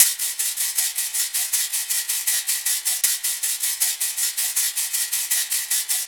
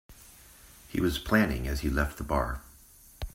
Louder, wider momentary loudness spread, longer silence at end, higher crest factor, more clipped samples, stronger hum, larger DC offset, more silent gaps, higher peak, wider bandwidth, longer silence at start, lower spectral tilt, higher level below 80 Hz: first, -20 LUFS vs -29 LUFS; second, 2 LU vs 17 LU; about the same, 0 s vs 0.05 s; about the same, 24 dB vs 22 dB; neither; neither; neither; neither; first, 0 dBFS vs -8 dBFS; first, over 20 kHz vs 16 kHz; about the same, 0 s vs 0.1 s; second, 6.5 dB/octave vs -5.5 dB/octave; second, -88 dBFS vs -38 dBFS